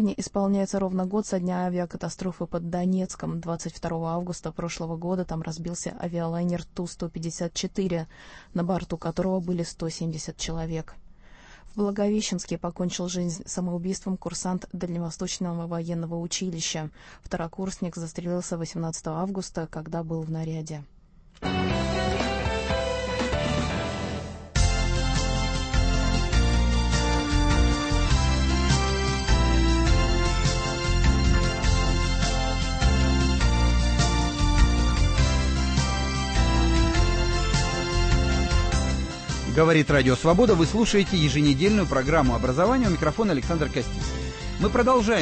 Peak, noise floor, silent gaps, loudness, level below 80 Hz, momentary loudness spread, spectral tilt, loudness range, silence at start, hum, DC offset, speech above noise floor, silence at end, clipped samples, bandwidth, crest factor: -8 dBFS; -49 dBFS; none; -25 LUFS; -28 dBFS; 11 LU; -5 dB/octave; 9 LU; 0 s; none; under 0.1%; 23 dB; 0 s; under 0.1%; 8.8 kHz; 18 dB